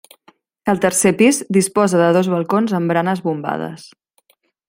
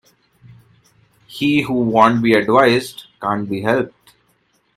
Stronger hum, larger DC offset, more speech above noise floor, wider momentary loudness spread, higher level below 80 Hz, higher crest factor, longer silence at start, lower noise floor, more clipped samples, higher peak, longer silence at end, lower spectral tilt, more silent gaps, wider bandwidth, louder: neither; neither; about the same, 44 dB vs 46 dB; second, 11 LU vs 14 LU; about the same, -60 dBFS vs -56 dBFS; about the same, 16 dB vs 18 dB; second, 0.65 s vs 1.3 s; about the same, -60 dBFS vs -62 dBFS; neither; about the same, -2 dBFS vs 0 dBFS; about the same, 0.85 s vs 0.9 s; about the same, -5 dB/octave vs -6 dB/octave; neither; about the same, 16.5 kHz vs 15.5 kHz; about the same, -16 LUFS vs -16 LUFS